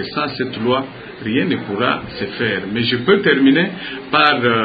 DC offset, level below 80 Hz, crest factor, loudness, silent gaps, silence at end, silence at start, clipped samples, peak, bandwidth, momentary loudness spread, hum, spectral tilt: under 0.1%; -50 dBFS; 18 dB; -17 LUFS; none; 0 s; 0 s; under 0.1%; 0 dBFS; 5 kHz; 9 LU; none; -8.5 dB/octave